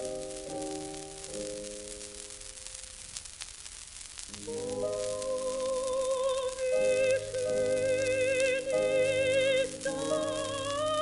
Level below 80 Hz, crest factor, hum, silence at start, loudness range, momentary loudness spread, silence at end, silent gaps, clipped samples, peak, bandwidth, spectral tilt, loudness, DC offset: -58 dBFS; 22 dB; none; 0 s; 12 LU; 15 LU; 0 s; none; under 0.1%; -10 dBFS; 11.5 kHz; -2.5 dB/octave; -31 LUFS; under 0.1%